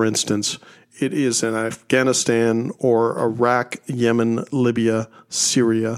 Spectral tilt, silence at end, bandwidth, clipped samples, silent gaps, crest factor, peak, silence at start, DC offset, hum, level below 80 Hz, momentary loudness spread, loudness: -4 dB/octave; 0 s; 15.5 kHz; under 0.1%; none; 16 dB; -4 dBFS; 0 s; under 0.1%; none; -64 dBFS; 8 LU; -20 LUFS